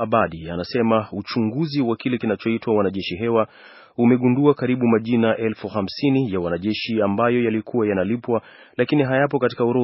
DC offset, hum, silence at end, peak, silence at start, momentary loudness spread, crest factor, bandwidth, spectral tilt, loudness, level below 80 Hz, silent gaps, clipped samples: under 0.1%; none; 0 s; -2 dBFS; 0 s; 7 LU; 18 dB; 5.8 kHz; -5.5 dB/octave; -21 LUFS; -56 dBFS; none; under 0.1%